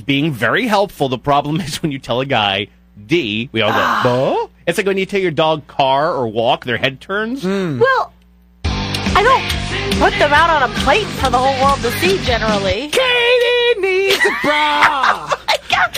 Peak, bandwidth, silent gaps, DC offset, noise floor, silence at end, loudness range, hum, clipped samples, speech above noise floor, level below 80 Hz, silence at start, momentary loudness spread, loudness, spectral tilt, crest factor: 0 dBFS; 15.5 kHz; none; under 0.1%; -48 dBFS; 0 s; 4 LU; none; under 0.1%; 32 dB; -34 dBFS; 0 s; 8 LU; -15 LUFS; -4.5 dB/octave; 16 dB